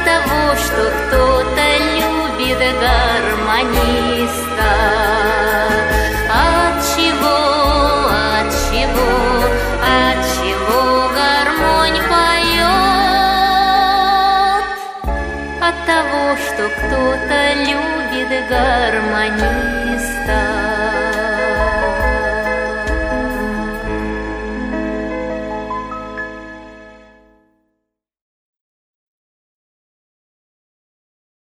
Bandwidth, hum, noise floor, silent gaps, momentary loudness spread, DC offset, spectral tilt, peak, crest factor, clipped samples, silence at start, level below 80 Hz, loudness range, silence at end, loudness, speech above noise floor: 15.5 kHz; none; -75 dBFS; none; 10 LU; under 0.1%; -4 dB/octave; 0 dBFS; 16 dB; under 0.1%; 0 s; -26 dBFS; 10 LU; 4.65 s; -15 LUFS; 60 dB